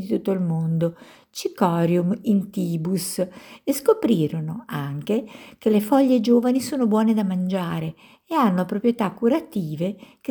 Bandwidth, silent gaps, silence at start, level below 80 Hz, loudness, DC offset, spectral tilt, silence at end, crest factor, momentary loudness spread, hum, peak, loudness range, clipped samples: over 20 kHz; none; 0 s; -64 dBFS; -22 LUFS; under 0.1%; -7 dB/octave; 0.05 s; 18 dB; 11 LU; none; -4 dBFS; 3 LU; under 0.1%